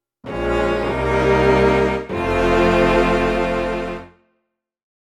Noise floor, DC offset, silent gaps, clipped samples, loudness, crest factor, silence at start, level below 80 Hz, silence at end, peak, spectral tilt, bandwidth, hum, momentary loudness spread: -74 dBFS; under 0.1%; none; under 0.1%; -18 LUFS; 14 dB; 0.25 s; -30 dBFS; 0.95 s; -4 dBFS; -6.5 dB/octave; 13.5 kHz; none; 11 LU